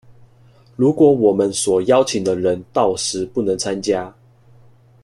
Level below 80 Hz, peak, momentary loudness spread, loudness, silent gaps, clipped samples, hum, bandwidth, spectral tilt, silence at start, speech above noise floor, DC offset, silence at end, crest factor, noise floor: -56 dBFS; -2 dBFS; 8 LU; -17 LUFS; none; under 0.1%; none; 12.5 kHz; -5 dB/octave; 0.8 s; 33 dB; under 0.1%; 0.95 s; 16 dB; -49 dBFS